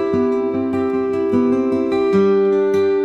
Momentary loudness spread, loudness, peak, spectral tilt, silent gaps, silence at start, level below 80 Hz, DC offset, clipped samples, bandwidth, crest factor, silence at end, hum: 5 LU; -17 LUFS; -6 dBFS; -8 dB/octave; none; 0 s; -56 dBFS; 0.1%; under 0.1%; 6.6 kHz; 10 dB; 0 s; none